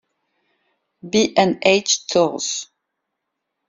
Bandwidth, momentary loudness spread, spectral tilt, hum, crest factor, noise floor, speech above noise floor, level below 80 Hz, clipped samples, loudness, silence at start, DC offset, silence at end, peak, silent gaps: 7.8 kHz; 10 LU; -3 dB/octave; none; 20 dB; -78 dBFS; 60 dB; -62 dBFS; under 0.1%; -18 LUFS; 1.05 s; under 0.1%; 1.05 s; -2 dBFS; none